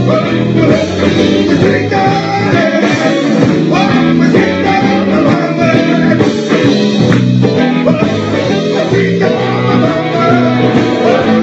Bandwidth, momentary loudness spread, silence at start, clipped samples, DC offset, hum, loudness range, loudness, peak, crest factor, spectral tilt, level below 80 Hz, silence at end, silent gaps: 8.2 kHz; 2 LU; 0 s; 0.3%; under 0.1%; none; 1 LU; -10 LUFS; 0 dBFS; 10 dB; -6.5 dB/octave; -42 dBFS; 0 s; none